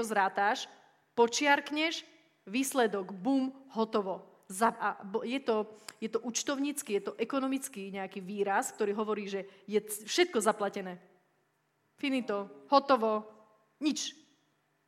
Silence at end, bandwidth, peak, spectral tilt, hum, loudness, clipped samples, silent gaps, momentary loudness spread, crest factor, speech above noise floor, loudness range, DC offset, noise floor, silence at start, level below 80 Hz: 0.75 s; 16.5 kHz; -10 dBFS; -3 dB/octave; none; -32 LUFS; under 0.1%; none; 12 LU; 24 dB; 44 dB; 3 LU; under 0.1%; -75 dBFS; 0 s; -82 dBFS